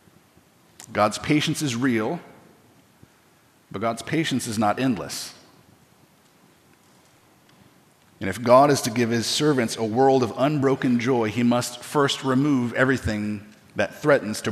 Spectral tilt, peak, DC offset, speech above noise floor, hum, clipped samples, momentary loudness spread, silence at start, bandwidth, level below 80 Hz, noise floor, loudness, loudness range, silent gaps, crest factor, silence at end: -5 dB/octave; -2 dBFS; under 0.1%; 36 dB; none; under 0.1%; 12 LU; 0.8 s; 15 kHz; -58 dBFS; -58 dBFS; -22 LUFS; 9 LU; none; 22 dB; 0 s